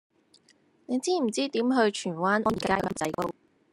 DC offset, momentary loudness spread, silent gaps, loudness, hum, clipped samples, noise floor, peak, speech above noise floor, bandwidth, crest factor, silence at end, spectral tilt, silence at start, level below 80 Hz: under 0.1%; 7 LU; none; -27 LUFS; none; under 0.1%; -64 dBFS; -10 dBFS; 37 dB; 16 kHz; 20 dB; 0.4 s; -4.5 dB/octave; 0.9 s; -60 dBFS